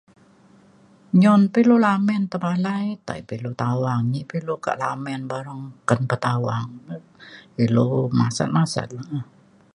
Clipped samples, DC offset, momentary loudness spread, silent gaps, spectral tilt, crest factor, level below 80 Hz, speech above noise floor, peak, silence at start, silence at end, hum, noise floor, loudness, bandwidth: under 0.1%; under 0.1%; 16 LU; none; -7 dB/octave; 20 dB; -60 dBFS; 32 dB; -2 dBFS; 1.15 s; 0.5 s; none; -53 dBFS; -22 LUFS; 11 kHz